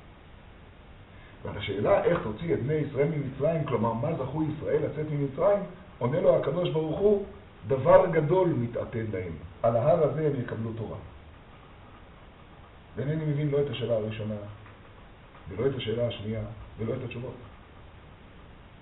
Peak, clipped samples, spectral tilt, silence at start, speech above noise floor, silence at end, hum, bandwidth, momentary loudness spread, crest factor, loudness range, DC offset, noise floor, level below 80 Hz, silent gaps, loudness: -4 dBFS; under 0.1%; -6.5 dB/octave; 0 s; 23 dB; 0.05 s; none; 4.1 kHz; 17 LU; 24 dB; 9 LU; under 0.1%; -50 dBFS; -52 dBFS; none; -28 LUFS